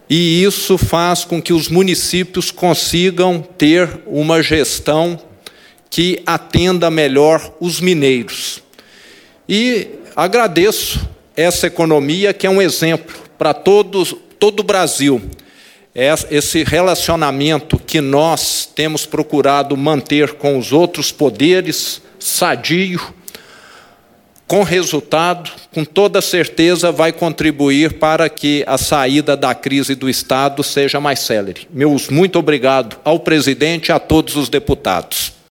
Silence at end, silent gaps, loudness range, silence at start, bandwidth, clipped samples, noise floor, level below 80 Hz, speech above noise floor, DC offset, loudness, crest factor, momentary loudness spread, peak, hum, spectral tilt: 0.2 s; none; 3 LU; 0.1 s; 17.5 kHz; under 0.1%; -49 dBFS; -38 dBFS; 35 dB; under 0.1%; -14 LUFS; 14 dB; 7 LU; 0 dBFS; none; -4 dB/octave